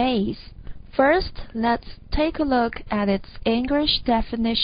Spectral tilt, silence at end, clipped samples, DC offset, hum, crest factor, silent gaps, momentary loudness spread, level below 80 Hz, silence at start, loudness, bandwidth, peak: -10 dB/octave; 0 s; under 0.1%; under 0.1%; none; 18 dB; none; 10 LU; -36 dBFS; 0 s; -23 LUFS; 5.2 kHz; -6 dBFS